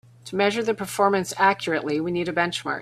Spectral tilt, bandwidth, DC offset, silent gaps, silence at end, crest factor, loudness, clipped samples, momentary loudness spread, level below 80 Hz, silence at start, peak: -4.5 dB/octave; 15.5 kHz; under 0.1%; none; 0 s; 20 dB; -23 LUFS; under 0.1%; 5 LU; -62 dBFS; 0.25 s; -4 dBFS